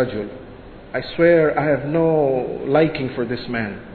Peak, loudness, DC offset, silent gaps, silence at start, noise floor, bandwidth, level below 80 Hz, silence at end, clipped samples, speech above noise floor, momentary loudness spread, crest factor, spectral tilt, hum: -2 dBFS; -19 LUFS; under 0.1%; none; 0 s; -39 dBFS; 4.5 kHz; -46 dBFS; 0 s; under 0.1%; 20 dB; 14 LU; 16 dB; -10.5 dB/octave; none